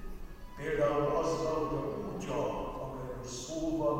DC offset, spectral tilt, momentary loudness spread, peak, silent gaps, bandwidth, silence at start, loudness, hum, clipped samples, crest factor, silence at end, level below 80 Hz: under 0.1%; -5.5 dB/octave; 11 LU; -18 dBFS; none; 16 kHz; 0 s; -34 LUFS; none; under 0.1%; 16 dB; 0 s; -48 dBFS